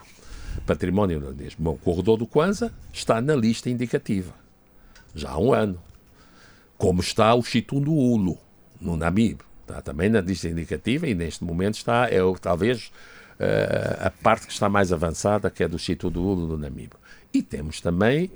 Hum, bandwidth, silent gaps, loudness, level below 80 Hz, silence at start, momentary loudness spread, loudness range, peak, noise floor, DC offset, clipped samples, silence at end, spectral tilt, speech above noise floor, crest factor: none; over 20 kHz; none; -24 LUFS; -44 dBFS; 0 s; 13 LU; 3 LU; -4 dBFS; -52 dBFS; under 0.1%; under 0.1%; 0.05 s; -6 dB/octave; 29 dB; 20 dB